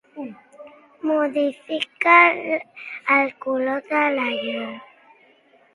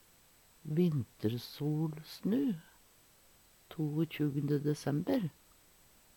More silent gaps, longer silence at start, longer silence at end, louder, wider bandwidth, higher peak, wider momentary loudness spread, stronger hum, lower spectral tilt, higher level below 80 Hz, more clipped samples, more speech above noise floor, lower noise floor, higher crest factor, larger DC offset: neither; second, 0.15 s vs 0.65 s; about the same, 0.9 s vs 0.85 s; first, -20 LUFS vs -35 LUFS; second, 11.5 kHz vs 19 kHz; first, 0 dBFS vs -20 dBFS; first, 21 LU vs 7 LU; neither; second, -4.5 dB/octave vs -7.5 dB/octave; about the same, -76 dBFS vs -72 dBFS; neither; first, 36 dB vs 30 dB; second, -56 dBFS vs -64 dBFS; first, 22 dB vs 16 dB; neither